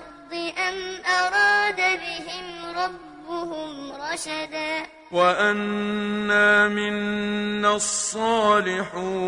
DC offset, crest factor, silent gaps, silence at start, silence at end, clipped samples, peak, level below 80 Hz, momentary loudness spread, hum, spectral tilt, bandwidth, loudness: under 0.1%; 18 dB; none; 0 s; 0 s; under 0.1%; -6 dBFS; -58 dBFS; 14 LU; none; -3 dB/octave; 11 kHz; -22 LUFS